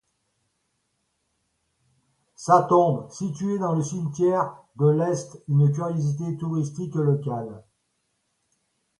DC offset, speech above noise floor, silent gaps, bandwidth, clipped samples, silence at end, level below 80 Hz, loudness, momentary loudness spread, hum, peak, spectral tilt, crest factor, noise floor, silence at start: under 0.1%; 51 dB; none; 11 kHz; under 0.1%; 1.4 s; -68 dBFS; -24 LUFS; 11 LU; none; -6 dBFS; -8 dB/octave; 20 dB; -74 dBFS; 2.4 s